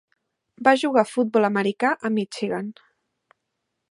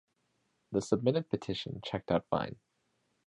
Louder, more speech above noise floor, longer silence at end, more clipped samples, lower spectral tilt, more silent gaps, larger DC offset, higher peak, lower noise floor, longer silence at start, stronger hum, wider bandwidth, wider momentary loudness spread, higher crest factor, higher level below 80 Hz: first, -22 LUFS vs -34 LUFS; first, 58 dB vs 45 dB; first, 1.2 s vs 0.7 s; neither; about the same, -5.5 dB/octave vs -6.5 dB/octave; neither; neither; first, -2 dBFS vs -14 dBFS; about the same, -79 dBFS vs -77 dBFS; about the same, 0.6 s vs 0.7 s; neither; about the same, 11.5 kHz vs 11 kHz; about the same, 9 LU vs 8 LU; about the same, 22 dB vs 22 dB; second, -74 dBFS vs -62 dBFS